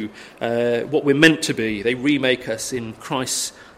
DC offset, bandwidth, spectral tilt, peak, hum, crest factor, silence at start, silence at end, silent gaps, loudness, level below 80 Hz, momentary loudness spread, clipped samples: under 0.1%; 16 kHz; -3.5 dB/octave; 0 dBFS; none; 20 dB; 0 s; 0.1 s; none; -20 LUFS; -54 dBFS; 13 LU; under 0.1%